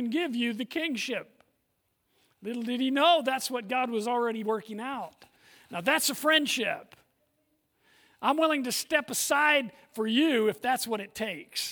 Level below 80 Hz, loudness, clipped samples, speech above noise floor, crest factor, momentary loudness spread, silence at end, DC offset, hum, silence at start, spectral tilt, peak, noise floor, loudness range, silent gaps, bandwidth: -78 dBFS; -28 LUFS; under 0.1%; 48 dB; 20 dB; 13 LU; 0 s; under 0.1%; none; 0 s; -2 dB/octave; -10 dBFS; -76 dBFS; 3 LU; none; over 20 kHz